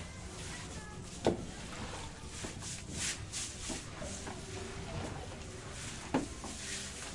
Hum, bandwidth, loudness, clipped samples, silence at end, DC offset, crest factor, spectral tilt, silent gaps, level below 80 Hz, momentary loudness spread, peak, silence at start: none; 11.5 kHz; -41 LUFS; under 0.1%; 0 s; under 0.1%; 26 dB; -3.5 dB/octave; none; -52 dBFS; 9 LU; -14 dBFS; 0 s